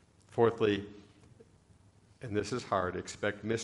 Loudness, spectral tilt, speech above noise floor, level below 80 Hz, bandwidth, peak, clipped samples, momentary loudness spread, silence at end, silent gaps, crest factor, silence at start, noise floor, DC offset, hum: -33 LUFS; -5.5 dB/octave; 30 dB; -66 dBFS; 11.5 kHz; -14 dBFS; under 0.1%; 12 LU; 0 s; none; 22 dB; 0.3 s; -62 dBFS; under 0.1%; none